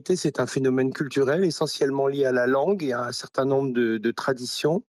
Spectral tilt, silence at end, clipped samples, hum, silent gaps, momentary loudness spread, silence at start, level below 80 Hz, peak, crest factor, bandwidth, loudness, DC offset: -5.5 dB/octave; 0.1 s; under 0.1%; none; none; 5 LU; 0.05 s; -70 dBFS; -12 dBFS; 12 dB; 13 kHz; -24 LUFS; under 0.1%